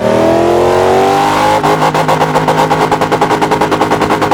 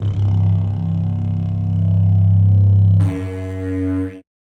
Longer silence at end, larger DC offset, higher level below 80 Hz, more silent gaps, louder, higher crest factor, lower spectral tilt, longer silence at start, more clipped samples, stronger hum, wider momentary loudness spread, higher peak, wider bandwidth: second, 0 s vs 0.3 s; neither; about the same, -38 dBFS vs -40 dBFS; neither; first, -10 LUFS vs -17 LUFS; about the same, 10 dB vs 10 dB; second, -5 dB/octave vs -10.5 dB/octave; about the same, 0 s vs 0 s; first, 0.4% vs under 0.1%; neither; second, 2 LU vs 11 LU; first, 0 dBFS vs -6 dBFS; first, 18.5 kHz vs 3.4 kHz